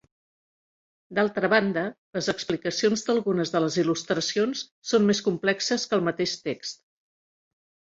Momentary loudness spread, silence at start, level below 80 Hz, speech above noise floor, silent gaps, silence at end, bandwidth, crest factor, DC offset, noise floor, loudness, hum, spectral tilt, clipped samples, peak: 9 LU; 1.1 s; -66 dBFS; over 65 dB; 1.98-2.13 s, 4.71-4.82 s; 1.2 s; 7.8 kHz; 20 dB; under 0.1%; under -90 dBFS; -25 LUFS; none; -4 dB/octave; under 0.1%; -6 dBFS